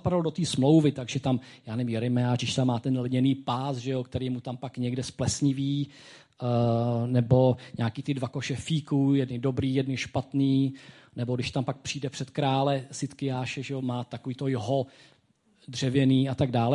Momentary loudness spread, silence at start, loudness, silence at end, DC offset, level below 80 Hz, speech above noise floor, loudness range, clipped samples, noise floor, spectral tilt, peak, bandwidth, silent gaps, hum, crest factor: 10 LU; 0.05 s; -28 LUFS; 0 s; under 0.1%; -54 dBFS; 38 dB; 4 LU; under 0.1%; -65 dBFS; -6.5 dB/octave; -10 dBFS; 11.5 kHz; none; none; 18 dB